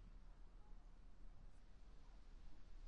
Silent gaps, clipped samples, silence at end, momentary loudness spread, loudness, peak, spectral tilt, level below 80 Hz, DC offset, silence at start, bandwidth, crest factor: none; under 0.1%; 0 s; 2 LU; -68 LUFS; -46 dBFS; -6 dB/octave; -60 dBFS; under 0.1%; 0 s; 8.2 kHz; 10 dB